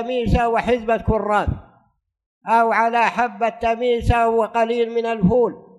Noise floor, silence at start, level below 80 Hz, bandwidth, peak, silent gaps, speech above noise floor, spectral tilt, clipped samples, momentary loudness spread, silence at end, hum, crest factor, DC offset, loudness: -62 dBFS; 0 s; -32 dBFS; 11.5 kHz; -4 dBFS; 2.26-2.41 s; 43 dB; -7 dB/octave; under 0.1%; 5 LU; 0.2 s; none; 16 dB; under 0.1%; -19 LUFS